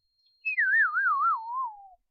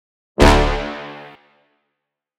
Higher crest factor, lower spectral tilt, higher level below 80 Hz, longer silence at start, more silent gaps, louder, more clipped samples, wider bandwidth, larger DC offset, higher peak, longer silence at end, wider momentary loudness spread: second, 12 dB vs 18 dB; second, 1 dB/octave vs -5.5 dB/octave; second, -82 dBFS vs -24 dBFS; about the same, 0.45 s vs 0.4 s; neither; second, -25 LUFS vs -16 LUFS; neither; second, 5.6 kHz vs 15 kHz; neither; second, -16 dBFS vs 0 dBFS; second, 0.25 s vs 1.15 s; second, 12 LU vs 21 LU